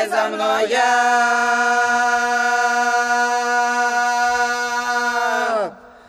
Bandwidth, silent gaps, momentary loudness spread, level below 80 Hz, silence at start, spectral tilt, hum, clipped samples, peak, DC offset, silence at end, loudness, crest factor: 14 kHz; none; 4 LU; -60 dBFS; 0 s; -0.5 dB/octave; none; under 0.1%; -6 dBFS; under 0.1%; 0.25 s; -17 LUFS; 12 dB